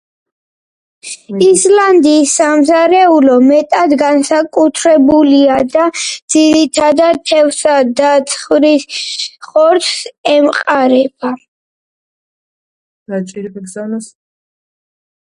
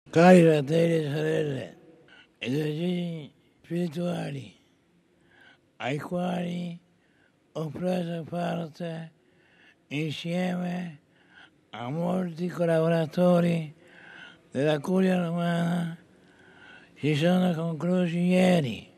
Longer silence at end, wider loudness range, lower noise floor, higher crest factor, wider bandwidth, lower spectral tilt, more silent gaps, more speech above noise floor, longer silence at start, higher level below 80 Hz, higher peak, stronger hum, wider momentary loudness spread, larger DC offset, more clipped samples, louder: first, 1.25 s vs 0.15 s; first, 15 LU vs 8 LU; first, under -90 dBFS vs -65 dBFS; second, 12 dB vs 22 dB; second, 11.5 kHz vs 13 kHz; second, -3 dB/octave vs -7 dB/octave; first, 6.22-6.28 s, 10.18-10.24 s, 11.48-13.06 s vs none; first, over 80 dB vs 39 dB; first, 1.05 s vs 0.05 s; first, -52 dBFS vs -72 dBFS; first, 0 dBFS vs -6 dBFS; neither; second, 14 LU vs 17 LU; neither; neither; first, -10 LUFS vs -26 LUFS